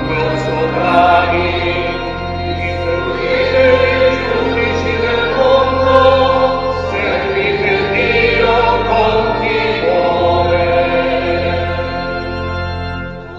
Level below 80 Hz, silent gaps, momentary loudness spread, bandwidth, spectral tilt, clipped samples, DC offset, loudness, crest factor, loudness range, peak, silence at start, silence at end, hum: -32 dBFS; none; 10 LU; 7.6 kHz; -6.5 dB/octave; under 0.1%; 0.5%; -14 LUFS; 14 dB; 3 LU; 0 dBFS; 0 s; 0 s; none